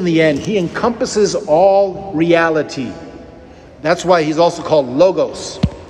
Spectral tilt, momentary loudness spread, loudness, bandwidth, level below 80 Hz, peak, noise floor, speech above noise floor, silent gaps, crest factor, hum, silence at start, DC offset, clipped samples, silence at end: -5.5 dB/octave; 11 LU; -15 LUFS; 11 kHz; -42 dBFS; 0 dBFS; -38 dBFS; 24 dB; none; 14 dB; none; 0 s; under 0.1%; under 0.1%; 0 s